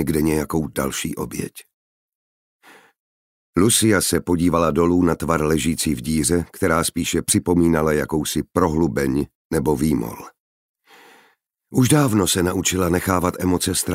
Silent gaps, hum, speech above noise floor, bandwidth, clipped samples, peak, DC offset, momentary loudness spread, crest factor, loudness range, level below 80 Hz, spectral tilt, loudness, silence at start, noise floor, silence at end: 1.73-2.09 s, 2.15-2.60 s, 2.99-3.53 s, 9.35-9.50 s, 10.40-10.75 s; none; 41 dB; 16 kHz; under 0.1%; -2 dBFS; under 0.1%; 9 LU; 18 dB; 5 LU; -40 dBFS; -4.5 dB/octave; -19 LUFS; 0 s; -61 dBFS; 0 s